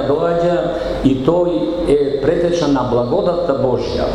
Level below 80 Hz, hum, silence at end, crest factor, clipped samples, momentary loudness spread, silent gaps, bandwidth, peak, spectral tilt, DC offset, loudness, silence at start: -34 dBFS; none; 0 s; 14 dB; under 0.1%; 3 LU; none; 11 kHz; -2 dBFS; -7 dB/octave; under 0.1%; -16 LUFS; 0 s